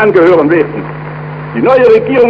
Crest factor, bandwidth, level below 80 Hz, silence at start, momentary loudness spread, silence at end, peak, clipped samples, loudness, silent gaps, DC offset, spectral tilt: 8 dB; 5.8 kHz; -44 dBFS; 0 s; 16 LU; 0 s; 0 dBFS; under 0.1%; -8 LUFS; none; under 0.1%; -8.5 dB/octave